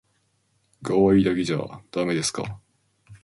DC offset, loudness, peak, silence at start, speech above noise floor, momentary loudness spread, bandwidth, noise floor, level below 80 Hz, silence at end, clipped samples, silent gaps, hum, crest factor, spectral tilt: under 0.1%; -23 LUFS; -6 dBFS; 0.8 s; 46 dB; 17 LU; 11.5 kHz; -69 dBFS; -52 dBFS; 0.1 s; under 0.1%; none; none; 18 dB; -5.5 dB/octave